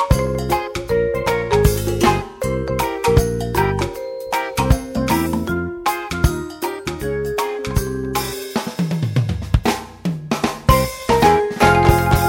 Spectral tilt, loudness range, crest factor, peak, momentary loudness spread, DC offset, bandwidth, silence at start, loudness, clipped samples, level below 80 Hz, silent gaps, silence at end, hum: -5.5 dB/octave; 5 LU; 18 dB; 0 dBFS; 9 LU; under 0.1%; 16.5 kHz; 0 s; -19 LUFS; under 0.1%; -28 dBFS; none; 0 s; none